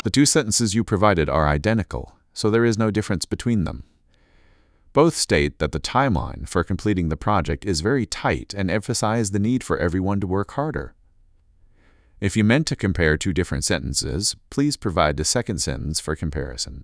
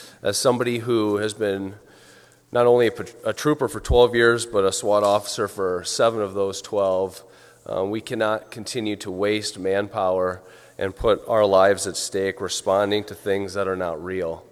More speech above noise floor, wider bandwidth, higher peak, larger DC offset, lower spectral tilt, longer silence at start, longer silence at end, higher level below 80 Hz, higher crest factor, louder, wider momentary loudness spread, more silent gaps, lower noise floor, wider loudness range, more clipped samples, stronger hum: first, 36 dB vs 29 dB; second, 11 kHz vs 14.5 kHz; about the same, -2 dBFS vs -2 dBFS; neither; about the same, -4.5 dB/octave vs -4 dB/octave; about the same, 0.05 s vs 0 s; about the same, 0 s vs 0.1 s; first, -36 dBFS vs -44 dBFS; about the same, 20 dB vs 20 dB; about the same, -22 LUFS vs -22 LUFS; about the same, 8 LU vs 10 LU; neither; first, -57 dBFS vs -51 dBFS; about the same, 3 LU vs 5 LU; neither; neither